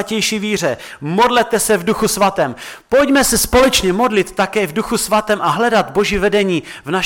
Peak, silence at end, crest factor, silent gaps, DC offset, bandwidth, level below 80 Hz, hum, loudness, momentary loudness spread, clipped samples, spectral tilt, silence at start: -4 dBFS; 0 s; 12 dB; none; under 0.1%; 17.5 kHz; -36 dBFS; none; -15 LUFS; 9 LU; under 0.1%; -3.5 dB/octave; 0 s